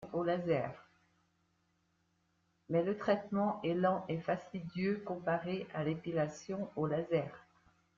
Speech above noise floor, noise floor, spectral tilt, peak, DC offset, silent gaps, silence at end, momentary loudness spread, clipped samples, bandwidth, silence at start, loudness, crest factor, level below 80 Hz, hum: 42 dB; -77 dBFS; -6 dB/octave; -18 dBFS; under 0.1%; none; 0.55 s; 7 LU; under 0.1%; 7.6 kHz; 0 s; -36 LUFS; 18 dB; -74 dBFS; none